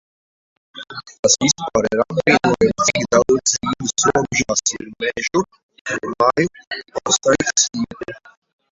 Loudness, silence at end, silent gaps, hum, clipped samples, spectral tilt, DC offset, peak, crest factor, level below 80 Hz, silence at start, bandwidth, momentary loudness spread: -18 LUFS; 0.55 s; 1.19-1.23 s, 5.63-5.69 s, 5.81-5.85 s, 6.67-6.71 s; none; under 0.1%; -2.5 dB/octave; under 0.1%; 0 dBFS; 18 dB; -50 dBFS; 0.75 s; 8.2 kHz; 15 LU